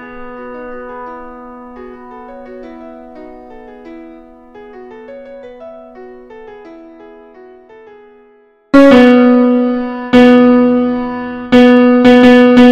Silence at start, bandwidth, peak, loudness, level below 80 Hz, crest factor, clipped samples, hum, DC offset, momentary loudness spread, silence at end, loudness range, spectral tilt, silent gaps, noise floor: 0 s; 7.4 kHz; 0 dBFS; -8 LUFS; -44 dBFS; 12 dB; 2%; none; under 0.1%; 27 LU; 0 s; 25 LU; -6 dB/octave; none; -48 dBFS